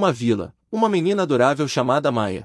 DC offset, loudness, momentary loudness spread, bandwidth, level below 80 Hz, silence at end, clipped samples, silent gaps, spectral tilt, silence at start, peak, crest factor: under 0.1%; -20 LUFS; 5 LU; 12 kHz; -60 dBFS; 0 s; under 0.1%; none; -6 dB/octave; 0 s; -4 dBFS; 16 dB